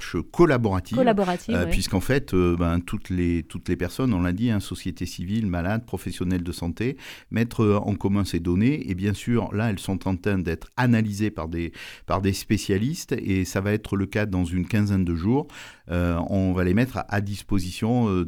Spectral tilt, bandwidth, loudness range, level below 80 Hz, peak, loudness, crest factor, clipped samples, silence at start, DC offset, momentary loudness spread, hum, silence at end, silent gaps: -6.5 dB/octave; 18 kHz; 3 LU; -40 dBFS; -4 dBFS; -25 LUFS; 20 dB; under 0.1%; 0 s; under 0.1%; 8 LU; none; 0 s; none